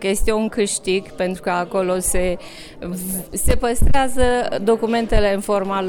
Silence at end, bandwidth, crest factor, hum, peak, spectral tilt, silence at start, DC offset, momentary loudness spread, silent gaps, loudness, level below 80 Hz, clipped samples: 0 s; 18 kHz; 16 dB; none; -2 dBFS; -4.5 dB/octave; 0 s; under 0.1%; 7 LU; none; -20 LUFS; -26 dBFS; under 0.1%